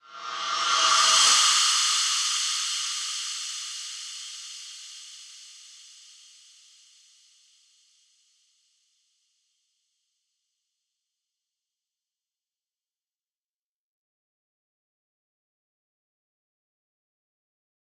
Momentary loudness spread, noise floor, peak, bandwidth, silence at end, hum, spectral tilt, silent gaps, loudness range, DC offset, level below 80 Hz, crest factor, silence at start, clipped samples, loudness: 25 LU; under -90 dBFS; -6 dBFS; 16 kHz; 12.2 s; none; 4.5 dB/octave; none; 23 LU; under 0.1%; under -90 dBFS; 24 dB; 0.1 s; under 0.1%; -22 LUFS